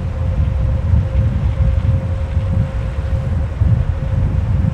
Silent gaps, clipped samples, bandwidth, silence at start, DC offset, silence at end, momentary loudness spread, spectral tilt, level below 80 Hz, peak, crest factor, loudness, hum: none; under 0.1%; 6 kHz; 0 s; under 0.1%; 0 s; 4 LU; -9 dB/octave; -20 dBFS; -4 dBFS; 12 dB; -18 LUFS; none